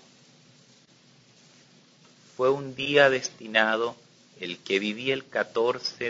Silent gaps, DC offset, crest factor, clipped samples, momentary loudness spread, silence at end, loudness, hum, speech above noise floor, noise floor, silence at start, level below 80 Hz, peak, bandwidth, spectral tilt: none; under 0.1%; 24 dB; under 0.1%; 15 LU; 0 s; -25 LUFS; none; 32 dB; -58 dBFS; 2.4 s; -72 dBFS; -4 dBFS; 7.8 kHz; -3.5 dB/octave